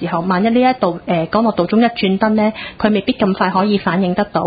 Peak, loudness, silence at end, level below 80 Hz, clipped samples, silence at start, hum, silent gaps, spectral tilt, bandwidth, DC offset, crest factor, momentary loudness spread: -2 dBFS; -15 LUFS; 0 s; -46 dBFS; under 0.1%; 0 s; none; none; -12 dB/octave; 5 kHz; under 0.1%; 14 dB; 4 LU